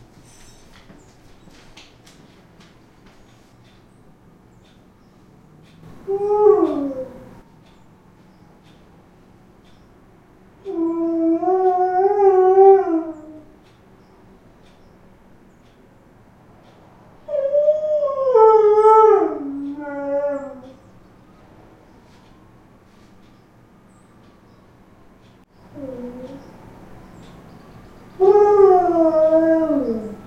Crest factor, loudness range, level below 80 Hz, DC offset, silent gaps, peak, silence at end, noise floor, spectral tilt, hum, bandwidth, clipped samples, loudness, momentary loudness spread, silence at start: 20 dB; 23 LU; -54 dBFS; under 0.1%; none; 0 dBFS; 0.05 s; -50 dBFS; -7.5 dB/octave; none; 6.8 kHz; under 0.1%; -16 LUFS; 22 LU; 6.05 s